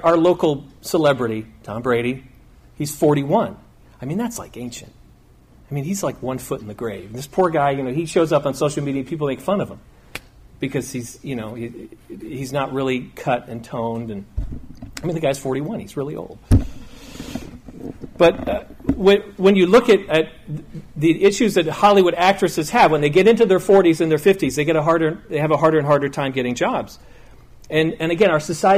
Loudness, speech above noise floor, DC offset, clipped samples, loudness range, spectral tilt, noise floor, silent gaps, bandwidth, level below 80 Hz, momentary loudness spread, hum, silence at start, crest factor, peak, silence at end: -19 LUFS; 31 dB; under 0.1%; under 0.1%; 11 LU; -5.5 dB/octave; -49 dBFS; none; 15.5 kHz; -38 dBFS; 19 LU; none; 0 s; 16 dB; -2 dBFS; 0 s